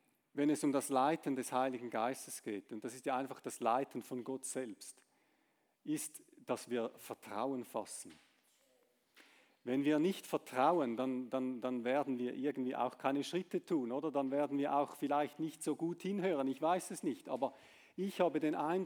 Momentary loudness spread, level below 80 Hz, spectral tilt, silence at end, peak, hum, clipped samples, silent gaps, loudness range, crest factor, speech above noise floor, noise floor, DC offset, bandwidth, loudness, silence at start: 11 LU; under -90 dBFS; -5 dB/octave; 0 s; -20 dBFS; none; under 0.1%; none; 7 LU; 20 dB; 41 dB; -78 dBFS; under 0.1%; over 20 kHz; -38 LUFS; 0.35 s